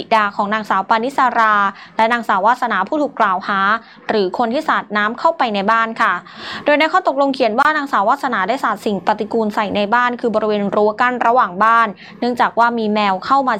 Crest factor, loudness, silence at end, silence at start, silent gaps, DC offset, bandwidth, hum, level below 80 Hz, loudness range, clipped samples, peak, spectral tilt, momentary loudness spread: 14 dB; -16 LUFS; 0 s; 0 s; none; under 0.1%; 15.5 kHz; none; -64 dBFS; 2 LU; under 0.1%; -2 dBFS; -5 dB/octave; 5 LU